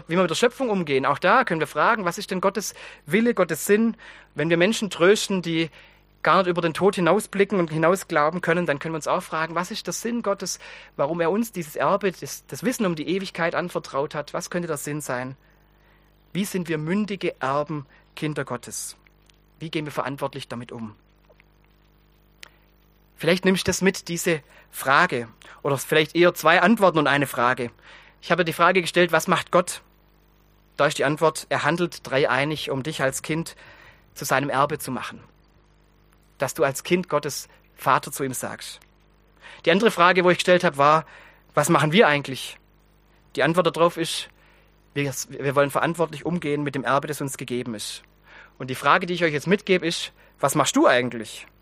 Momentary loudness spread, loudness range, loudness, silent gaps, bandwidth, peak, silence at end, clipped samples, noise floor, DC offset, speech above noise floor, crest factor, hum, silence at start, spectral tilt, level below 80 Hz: 14 LU; 9 LU; -23 LUFS; none; 15.5 kHz; 0 dBFS; 0.15 s; under 0.1%; -58 dBFS; under 0.1%; 35 dB; 22 dB; 50 Hz at -55 dBFS; 0.1 s; -4.5 dB/octave; -58 dBFS